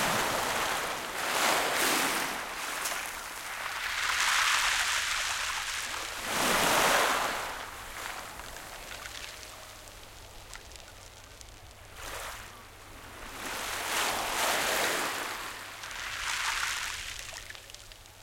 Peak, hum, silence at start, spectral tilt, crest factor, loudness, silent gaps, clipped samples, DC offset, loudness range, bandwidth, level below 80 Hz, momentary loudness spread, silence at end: -10 dBFS; none; 0 s; -0.5 dB/octave; 22 dB; -30 LUFS; none; under 0.1%; under 0.1%; 17 LU; 17 kHz; -54 dBFS; 22 LU; 0 s